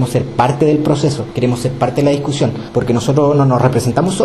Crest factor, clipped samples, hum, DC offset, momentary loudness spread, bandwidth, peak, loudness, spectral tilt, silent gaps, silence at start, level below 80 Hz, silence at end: 12 dB; under 0.1%; none; under 0.1%; 5 LU; 12.5 kHz; 0 dBFS; -14 LUFS; -6.5 dB/octave; none; 0 s; -40 dBFS; 0 s